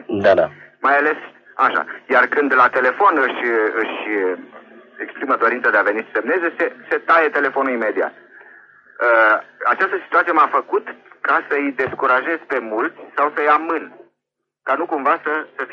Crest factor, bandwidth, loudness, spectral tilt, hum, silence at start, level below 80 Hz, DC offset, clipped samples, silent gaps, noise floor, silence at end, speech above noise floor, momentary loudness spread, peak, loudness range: 16 dB; 7 kHz; -18 LUFS; -6 dB/octave; none; 0.1 s; -68 dBFS; under 0.1%; under 0.1%; none; -79 dBFS; 0 s; 61 dB; 10 LU; -2 dBFS; 3 LU